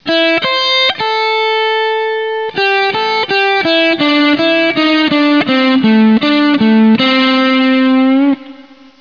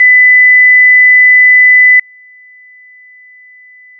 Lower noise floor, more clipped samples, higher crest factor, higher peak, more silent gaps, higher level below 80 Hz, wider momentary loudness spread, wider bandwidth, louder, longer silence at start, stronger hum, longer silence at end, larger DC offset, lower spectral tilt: about the same, -37 dBFS vs -38 dBFS; neither; about the same, 10 dB vs 6 dB; about the same, -2 dBFS vs -2 dBFS; neither; first, -56 dBFS vs under -90 dBFS; first, 5 LU vs 1 LU; first, 5.4 kHz vs 2.4 kHz; second, -11 LUFS vs -2 LUFS; about the same, 0.05 s vs 0 s; neither; second, 0.4 s vs 2 s; first, 0.4% vs under 0.1%; first, -5.5 dB/octave vs 1 dB/octave